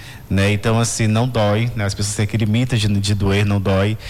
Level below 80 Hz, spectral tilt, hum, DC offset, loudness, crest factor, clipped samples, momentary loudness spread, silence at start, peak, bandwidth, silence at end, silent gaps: -38 dBFS; -5.5 dB/octave; none; under 0.1%; -18 LUFS; 8 dB; under 0.1%; 4 LU; 0 s; -10 dBFS; 14 kHz; 0 s; none